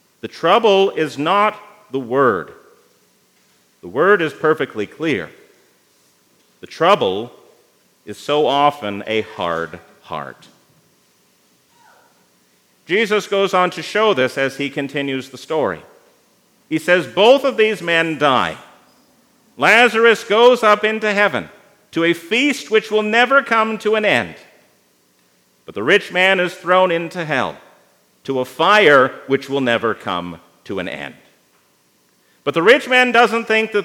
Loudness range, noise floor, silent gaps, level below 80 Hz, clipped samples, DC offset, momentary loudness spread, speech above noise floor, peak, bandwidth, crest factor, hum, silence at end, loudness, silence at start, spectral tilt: 8 LU; -58 dBFS; none; -68 dBFS; under 0.1%; under 0.1%; 15 LU; 42 dB; 0 dBFS; 16.5 kHz; 18 dB; none; 0 s; -16 LUFS; 0.25 s; -4.5 dB/octave